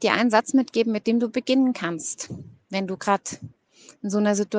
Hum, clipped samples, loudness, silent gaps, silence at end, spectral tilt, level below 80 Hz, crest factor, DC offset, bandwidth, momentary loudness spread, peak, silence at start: none; under 0.1%; -23 LUFS; none; 0 s; -4.5 dB/octave; -70 dBFS; 20 dB; under 0.1%; 9.8 kHz; 15 LU; -2 dBFS; 0 s